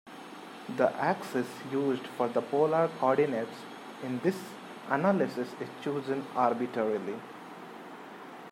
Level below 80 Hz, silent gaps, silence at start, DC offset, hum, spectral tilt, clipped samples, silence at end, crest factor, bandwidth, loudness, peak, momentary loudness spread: -82 dBFS; none; 0.05 s; under 0.1%; none; -6.5 dB/octave; under 0.1%; 0 s; 20 dB; 16 kHz; -31 LUFS; -12 dBFS; 18 LU